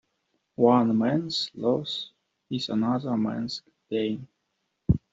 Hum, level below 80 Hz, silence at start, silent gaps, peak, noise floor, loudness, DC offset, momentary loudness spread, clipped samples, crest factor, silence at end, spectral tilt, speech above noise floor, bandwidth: none; -48 dBFS; 0.6 s; none; -6 dBFS; -78 dBFS; -27 LUFS; under 0.1%; 15 LU; under 0.1%; 20 dB; 0.15 s; -7 dB/octave; 52 dB; 7.8 kHz